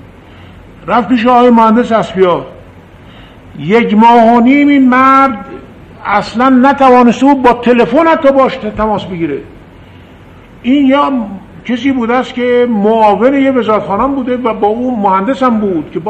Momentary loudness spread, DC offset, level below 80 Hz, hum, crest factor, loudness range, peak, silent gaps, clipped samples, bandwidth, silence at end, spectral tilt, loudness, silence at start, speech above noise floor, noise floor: 12 LU; under 0.1%; -40 dBFS; none; 10 dB; 5 LU; 0 dBFS; none; 0.4%; 8.6 kHz; 0 s; -7 dB/octave; -9 LUFS; 0.8 s; 27 dB; -35 dBFS